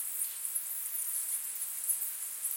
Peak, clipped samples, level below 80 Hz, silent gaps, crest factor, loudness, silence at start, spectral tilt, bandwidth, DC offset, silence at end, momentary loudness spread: -16 dBFS; under 0.1%; under -90 dBFS; none; 20 dB; -33 LUFS; 0 s; 4 dB/octave; 17 kHz; under 0.1%; 0 s; 3 LU